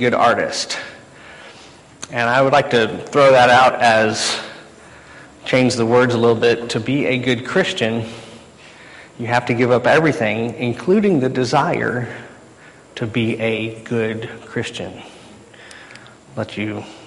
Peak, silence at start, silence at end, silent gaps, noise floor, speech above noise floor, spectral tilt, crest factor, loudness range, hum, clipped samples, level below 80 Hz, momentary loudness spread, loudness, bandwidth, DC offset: -2 dBFS; 0 s; 0 s; none; -44 dBFS; 27 dB; -5 dB/octave; 16 dB; 9 LU; none; under 0.1%; -54 dBFS; 19 LU; -17 LUFS; 11.5 kHz; under 0.1%